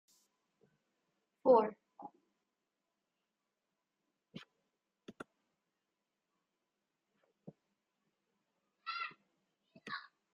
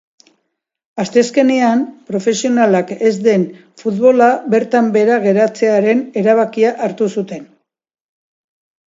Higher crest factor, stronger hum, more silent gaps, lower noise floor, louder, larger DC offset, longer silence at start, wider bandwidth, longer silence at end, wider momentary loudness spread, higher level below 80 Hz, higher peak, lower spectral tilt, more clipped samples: first, 28 dB vs 14 dB; neither; neither; first, -89 dBFS vs -71 dBFS; second, -35 LUFS vs -14 LUFS; neither; first, 1.45 s vs 0.95 s; about the same, 7.2 kHz vs 7.8 kHz; second, 0.35 s vs 1.45 s; first, 27 LU vs 10 LU; second, -88 dBFS vs -66 dBFS; second, -16 dBFS vs 0 dBFS; second, -3 dB/octave vs -5.5 dB/octave; neither